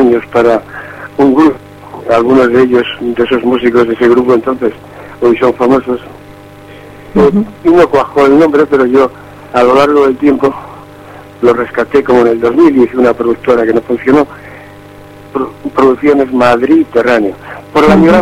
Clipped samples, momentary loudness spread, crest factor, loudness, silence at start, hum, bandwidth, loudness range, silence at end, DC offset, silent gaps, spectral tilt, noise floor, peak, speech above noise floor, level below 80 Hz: 0.9%; 12 LU; 10 dB; -9 LUFS; 0 s; none; 13 kHz; 3 LU; 0 s; under 0.1%; none; -7 dB/octave; -32 dBFS; 0 dBFS; 24 dB; -38 dBFS